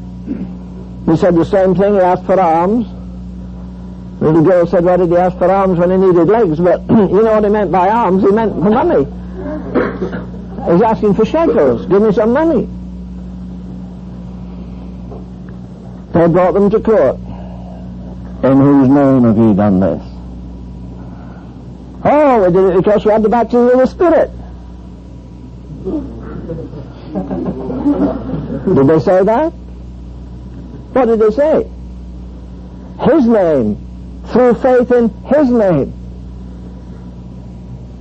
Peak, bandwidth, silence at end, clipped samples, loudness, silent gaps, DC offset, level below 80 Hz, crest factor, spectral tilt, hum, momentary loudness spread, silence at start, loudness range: -2 dBFS; 8.2 kHz; 0 s; under 0.1%; -12 LUFS; none; under 0.1%; -32 dBFS; 12 dB; -9.5 dB/octave; none; 21 LU; 0 s; 7 LU